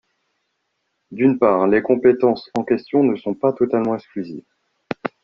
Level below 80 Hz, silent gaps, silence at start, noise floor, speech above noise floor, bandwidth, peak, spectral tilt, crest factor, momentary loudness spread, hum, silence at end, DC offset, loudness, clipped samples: -58 dBFS; none; 1.1 s; -73 dBFS; 55 dB; 6.8 kHz; -2 dBFS; -6.5 dB/octave; 16 dB; 15 LU; none; 0.15 s; under 0.1%; -18 LUFS; under 0.1%